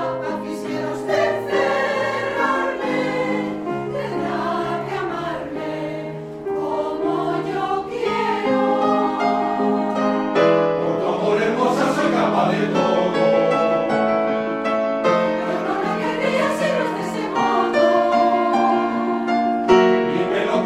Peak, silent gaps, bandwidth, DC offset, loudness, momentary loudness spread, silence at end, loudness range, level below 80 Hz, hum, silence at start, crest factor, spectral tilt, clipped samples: -2 dBFS; none; 14.5 kHz; under 0.1%; -20 LUFS; 9 LU; 0 s; 6 LU; -56 dBFS; none; 0 s; 18 dB; -6 dB/octave; under 0.1%